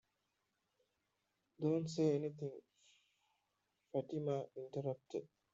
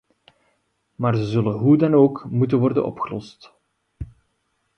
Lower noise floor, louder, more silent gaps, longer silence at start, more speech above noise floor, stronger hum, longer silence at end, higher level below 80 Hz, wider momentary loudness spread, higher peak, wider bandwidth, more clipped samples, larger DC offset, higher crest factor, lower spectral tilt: first, -86 dBFS vs -71 dBFS; second, -42 LUFS vs -20 LUFS; neither; first, 1.6 s vs 1 s; second, 46 dB vs 52 dB; neither; second, 0.3 s vs 0.75 s; second, -84 dBFS vs -50 dBFS; second, 12 LU vs 23 LU; second, -24 dBFS vs -4 dBFS; first, 7.8 kHz vs 6.6 kHz; neither; neither; about the same, 20 dB vs 18 dB; second, -8 dB/octave vs -9.5 dB/octave